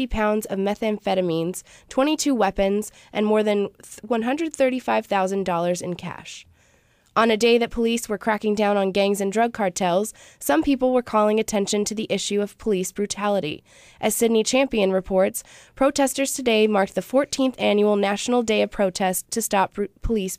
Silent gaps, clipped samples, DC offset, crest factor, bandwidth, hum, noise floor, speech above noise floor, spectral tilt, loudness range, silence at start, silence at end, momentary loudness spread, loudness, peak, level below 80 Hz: none; under 0.1%; under 0.1%; 16 dB; 15.5 kHz; none; -60 dBFS; 38 dB; -4 dB/octave; 3 LU; 0 s; 0.05 s; 8 LU; -22 LUFS; -8 dBFS; -44 dBFS